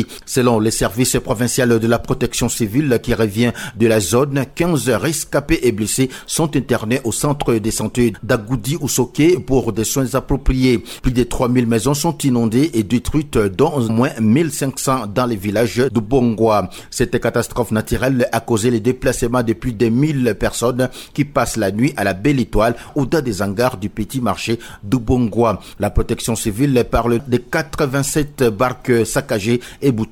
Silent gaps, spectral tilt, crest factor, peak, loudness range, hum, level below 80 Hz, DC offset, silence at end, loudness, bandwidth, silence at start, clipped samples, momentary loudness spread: none; -5.5 dB/octave; 14 dB; -4 dBFS; 2 LU; none; -32 dBFS; under 0.1%; 0.05 s; -17 LUFS; 18.5 kHz; 0 s; under 0.1%; 5 LU